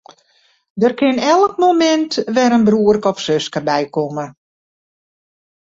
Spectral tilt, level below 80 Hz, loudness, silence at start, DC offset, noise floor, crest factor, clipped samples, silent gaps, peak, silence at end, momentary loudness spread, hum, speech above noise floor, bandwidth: -5 dB/octave; -56 dBFS; -15 LUFS; 0.75 s; under 0.1%; -58 dBFS; 14 dB; under 0.1%; none; -2 dBFS; 1.45 s; 9 LU; none; 43 dB; 7.8 kHz